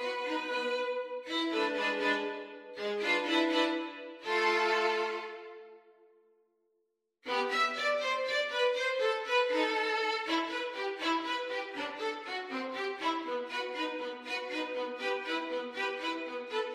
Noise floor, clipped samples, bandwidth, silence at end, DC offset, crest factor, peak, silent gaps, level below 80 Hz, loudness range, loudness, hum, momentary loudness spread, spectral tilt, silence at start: -80 dBFS; under 0.1%; 14.5 kHz; 0 s; under 0.1%; 18 dB; -16 dBFS; none; -82 dBFS; 5 LU; -32 LUFS; none; 9 LU; -2 dB/octave; 0 s